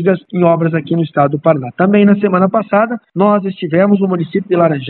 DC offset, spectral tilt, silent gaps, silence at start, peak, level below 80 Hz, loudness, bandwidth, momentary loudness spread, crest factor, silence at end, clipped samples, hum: under 0.1%; -12 dB/octave; none; 0 s; 0 dBFS; -60 dBFS; -13 LUFS; 4.2 kHz; 6 LU; 12 dB; 0 s; under 0.1%; none